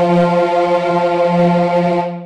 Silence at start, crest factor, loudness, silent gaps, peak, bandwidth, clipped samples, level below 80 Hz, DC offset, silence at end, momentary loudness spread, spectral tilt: 0 s; 10 dB; -14 LUFS; none; -4 dBFS; 8.8 kHz; under 0.1%; -52 dBFS; under 0.1%; 0 s; 2 LU; -8 dB/octave